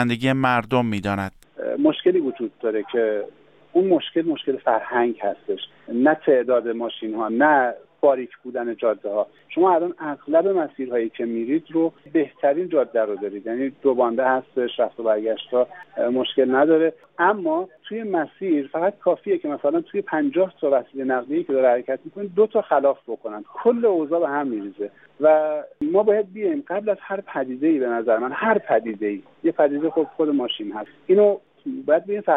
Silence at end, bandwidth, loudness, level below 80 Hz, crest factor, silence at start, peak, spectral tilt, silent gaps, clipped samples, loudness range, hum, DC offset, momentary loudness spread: 0 s; 9 kHz; -22 LUFS; -66 dBFS; 14 dB; 0 s; -6 dBFS; -7.5 dB/octave; none; under 0.1%; 2 LU; none; under 0.1%; 10 LU